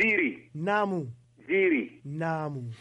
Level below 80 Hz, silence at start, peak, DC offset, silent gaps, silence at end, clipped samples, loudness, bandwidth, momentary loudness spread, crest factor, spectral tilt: -70 dBFS; 0 s; -14 dBFS; under 0.1%; none; 0.05 s; under 0.1%; -29 LUFS; 9.2 kHz; 11 LU; 14 dB; -7.5 dB/octave